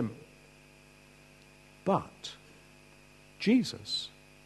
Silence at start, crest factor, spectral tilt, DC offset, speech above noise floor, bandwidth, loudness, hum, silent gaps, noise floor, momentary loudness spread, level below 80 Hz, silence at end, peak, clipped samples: 0 s; 22 dB; -5 dB/octave; under 0.1%; 27 dB; 12.5 kHz; -32 LUFS; 50 Hz at -60 dBFS; none; -57 dBFS; 23 LU; -68 dBFS; 0.35 s; -14 dBFS; under 0.1%